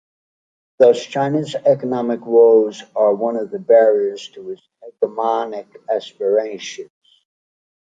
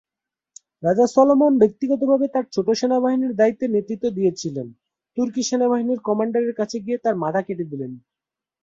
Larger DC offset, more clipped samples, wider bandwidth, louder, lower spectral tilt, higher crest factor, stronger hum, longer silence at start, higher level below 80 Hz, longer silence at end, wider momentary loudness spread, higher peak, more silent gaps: neither; neither; about the same, 7.8 kHz vs 7.8 kHz; first, -17 LUFS vs -20 LUFS; about the same, -6 dB/octave vs -6 dB/octave; about the same, 16 dB vs 18 dB; neither; about the same, 0.8 s vs 0.8 s; second, -72 dBFS vs -64 dBFS; first, 1.05 s vs 0.65 s; first, 19 LU vs 13 LU; about the same, -2 dBFS vs -2 dBFS; neither